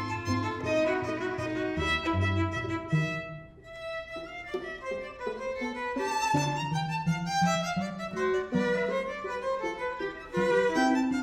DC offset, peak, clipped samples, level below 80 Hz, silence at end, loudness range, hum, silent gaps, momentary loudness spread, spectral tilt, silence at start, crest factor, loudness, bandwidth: under 0.1%; -14 dBFS; under 0.1%; -54 dBFS; 0 s; 5 LU; none; none; 10 LU; -5.5 dB/octave; 0 s; 16 dB; -30 LUFS; 16 kHz